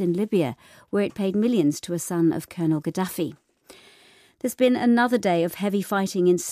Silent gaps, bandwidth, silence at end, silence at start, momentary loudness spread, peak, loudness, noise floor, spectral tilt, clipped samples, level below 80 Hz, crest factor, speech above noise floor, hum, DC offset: none; 15.5 kHz; 0 s; 0 s; 9 LU; -8 dBFS; -24 LUFS; -55 dBFS; -6 dB/octave; under 0.1%; -68 dBFS; 16 dB; 32 dB; none; under 0.1%